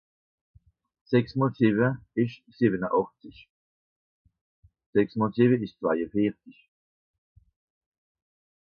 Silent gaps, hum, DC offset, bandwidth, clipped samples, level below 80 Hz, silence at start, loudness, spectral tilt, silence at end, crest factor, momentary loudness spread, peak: 3.50-4.25 s, 4.41-4.63 s, 4.86-4.93 s; none; under 0.1%; 5.6 kHz; under 0.1%; -64 dBFS; 1.1 s; -26 LUFS; -10 dB/octave; 2.15 s; 20 dB; 6 LU; -8 dBFS